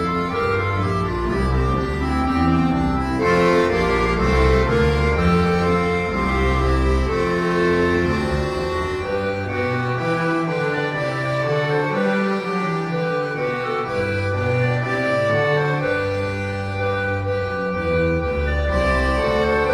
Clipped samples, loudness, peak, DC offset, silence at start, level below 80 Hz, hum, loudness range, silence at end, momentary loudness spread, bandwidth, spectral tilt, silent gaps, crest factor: under 0.1%; -20 LUFS; -6 dBFS; under 0.1%; 0 s; -28 dBFS; none; 4 LU; 0 s; 5 LU; 11.5 kHz; -7 dB/octave; none; 14 dB